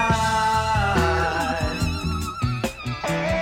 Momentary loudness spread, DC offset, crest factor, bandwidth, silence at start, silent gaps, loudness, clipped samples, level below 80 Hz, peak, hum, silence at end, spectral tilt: 7 LU; under 0.1%; 14 dB; 16.5 kHz; 0 s; none; -23 LUFS; under 0.1%; -34 dBFS; -8 dBFS; none; 0 s; -5 dB/octave